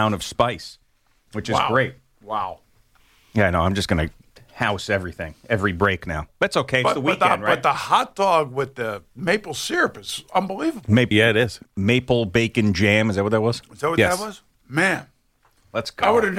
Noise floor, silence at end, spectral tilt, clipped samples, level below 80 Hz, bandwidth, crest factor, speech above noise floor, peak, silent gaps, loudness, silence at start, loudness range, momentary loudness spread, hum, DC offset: -62 dBFS; 0 s; -5 dB/octave; under 0.1%; -46 dBFS; 16 kHz; 18 dB; 41 dB; -4 dBFS; none; -21 LUFS; 0 s; 5 LU; 11 LU; none; under 0.1%